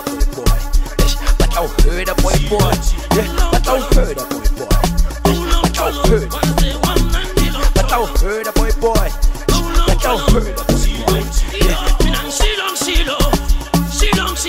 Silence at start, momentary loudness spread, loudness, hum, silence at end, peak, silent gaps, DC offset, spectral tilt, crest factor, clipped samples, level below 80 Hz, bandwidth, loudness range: 0 s; 3 LU; -16 LUFS; none; 0 s; -2 dBFS; none; 0.4%; -4.5 dB/octave; 12 dB; under 0.1%; -16 dBFS; 16.5 kHz; 1 LU